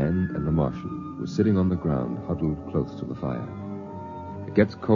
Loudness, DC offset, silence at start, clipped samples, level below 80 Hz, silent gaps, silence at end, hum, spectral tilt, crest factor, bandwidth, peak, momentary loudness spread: -27 LUFS; under 0.1%; 0 s; under 0.1%; -46 dBFS; none; 0 s; none; -9 dB/octave; 20 dB; 7.2 kHz; -6 dBFS; 13 LU